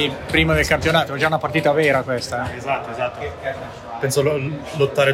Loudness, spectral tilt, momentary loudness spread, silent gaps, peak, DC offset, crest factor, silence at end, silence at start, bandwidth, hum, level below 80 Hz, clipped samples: -20 LUFS; -5 dB/octave; 11 LU; none; -2 dBFS; under 0.1%; 18 dB; 0 s; 0 s; 16 kHz; none; -40 dBFS; under 0.1%